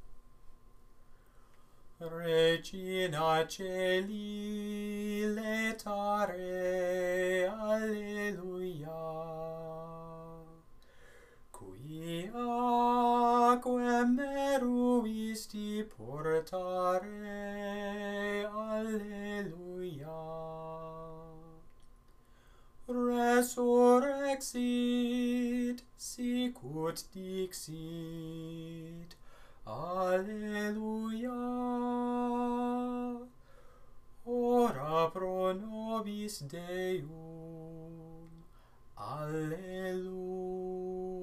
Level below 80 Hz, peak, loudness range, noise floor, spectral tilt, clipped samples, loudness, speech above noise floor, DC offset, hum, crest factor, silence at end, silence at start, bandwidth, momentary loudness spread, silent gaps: -60 dBFS; -14 dBFS; 12 LU; -60 dBFS; -5 dB/octave; under 0.1%; -34 LUFS; 26 dB; under 0.1%; none; 22 dB; 0 s; 0 s; 15.5 kHz; 17 LU; none